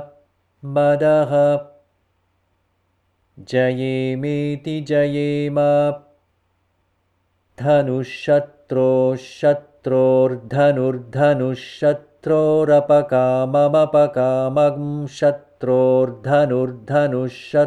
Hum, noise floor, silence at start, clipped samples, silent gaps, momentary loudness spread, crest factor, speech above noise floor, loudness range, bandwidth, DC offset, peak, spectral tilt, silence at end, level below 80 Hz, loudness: none; -66 dBFS; 0 s; under 0.1%; none; 9 LU; 14 dB; 49 dB; 5 LU; 10 kHz; under 0.1%; -4 dBFS; -8 dB/octave; 0 s; -62 dBFS; -18 LUFS